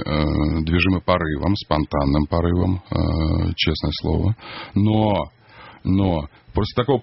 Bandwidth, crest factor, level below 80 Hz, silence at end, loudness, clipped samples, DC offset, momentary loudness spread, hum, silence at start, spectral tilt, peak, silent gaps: 6 kHz; 20 dB; -32 dBFS; 0 s; -21 LUFS; under 0.1%; under 0.1%; 7 LU; none; 0 s; -5.5 dB/octave; 0 dBFS; none